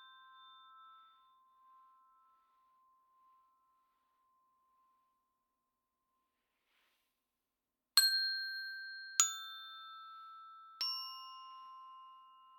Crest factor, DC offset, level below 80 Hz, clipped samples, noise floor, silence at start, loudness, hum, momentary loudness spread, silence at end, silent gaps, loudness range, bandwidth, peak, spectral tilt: 36 dB; under 0.1%; under -90 dBFS; under 0.1%; under -90 dBFS; 0 s; -34 LUFS; none; 25 LU; 0 s; none; 5 LU; 19 kHz; -8 dBFS; 7 dB/octave